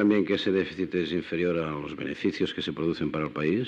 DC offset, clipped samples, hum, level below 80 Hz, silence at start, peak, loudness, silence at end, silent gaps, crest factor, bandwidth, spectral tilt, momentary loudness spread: under 0.1%; under 0.1%; none; -60 dBFS; 0 s; -12 dBFS; -28 LUFS; 0 s; none; 16 dB; 8.2 kHz; -7 dB/octave; 5 LU